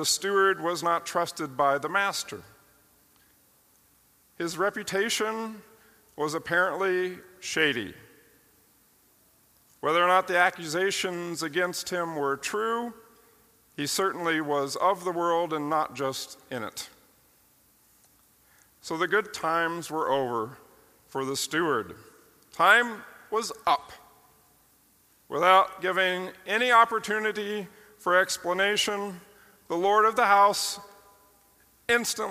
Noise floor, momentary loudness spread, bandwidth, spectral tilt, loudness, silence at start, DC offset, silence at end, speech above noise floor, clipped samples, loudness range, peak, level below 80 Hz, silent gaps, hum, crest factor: -63 dBFS; 16 LU; 15.5 kHz; -2.5 dB/octave; -26 LUFS; 0 s; under 0.1%; 0 s; 36 dB; under 0.1%; 7 LU; -4 dBFS; -72 dBFS; none; none; 24 dB